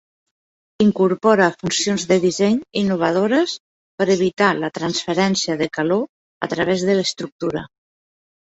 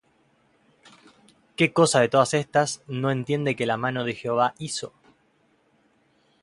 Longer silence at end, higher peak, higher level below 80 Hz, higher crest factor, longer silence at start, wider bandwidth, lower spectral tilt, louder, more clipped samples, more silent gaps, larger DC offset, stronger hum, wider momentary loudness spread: second, 0.8 s vs 1.55 s; about the same, -2 dBFS vs -4 dBFS; first, -58 dBFS vs -66 dBFS; about the same, 18 dB vs 22 dB; second, 0.8 s vs 1.6 s; second, 8 kHz vs 11.5 kHz; about the same, -4.5 dB/octave vs -4.5 dB/octave; first, -19 LUFS vs -23 LUFS; neither; first, 3.60-3.98 s, 6.09-6.41 s, 7.32-7.39 s vs none; neither; neither; second, 9 LU vs 12 LU